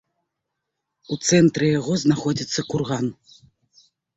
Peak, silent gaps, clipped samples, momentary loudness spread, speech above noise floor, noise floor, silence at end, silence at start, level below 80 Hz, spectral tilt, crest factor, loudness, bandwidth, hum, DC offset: -4 dBFS; none; under 0.1%; 10 LU; 60 dB; -80 dBFS; 1.05 s; 1.1 s; -58 dBFS; -5 dB/octave; 18 dB; -21 LUFS; 8 kHz; none; under 0.1%